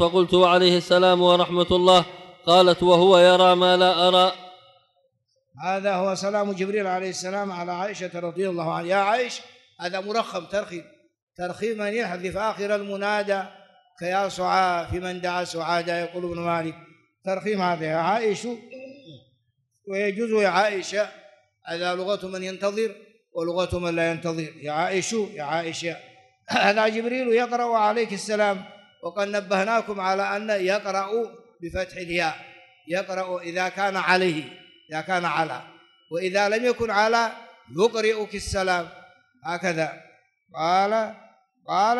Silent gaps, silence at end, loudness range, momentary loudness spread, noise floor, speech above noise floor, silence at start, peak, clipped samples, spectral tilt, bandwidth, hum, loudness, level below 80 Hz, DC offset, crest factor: 11.22-11.27 s; 0 s; 10 LU; 16 LU; -71 dBFS; 49 dB; 0 s; -4 dBFS; under 0.1%; -4.5 dB/octave; 12 kHz; none; -23 LUFS; -54 dBFS; under 0.1%; 18 dB